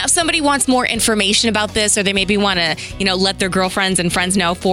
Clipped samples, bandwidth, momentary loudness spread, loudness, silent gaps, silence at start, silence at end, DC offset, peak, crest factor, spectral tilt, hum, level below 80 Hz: under 0.1%; 16.5 kHz; 4 LU; -15 LUFS; none; 0 s; 0 s; under 0.1%; -4 dBFS; 12 dB; -2.5 dB/octave; none; -38 dBFS